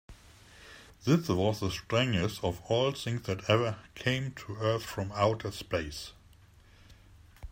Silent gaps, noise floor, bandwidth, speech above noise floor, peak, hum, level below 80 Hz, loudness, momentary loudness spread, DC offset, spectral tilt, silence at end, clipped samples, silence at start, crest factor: none; -58 dBFS; 16 kHz; 27 dB; -10 dBFS; none; -56 dBFS; -31 LUFS; 13 LU; under 0.1%; -5.5 dB/octave; 0 s; under 0.1%; 0.1 s; 22 dB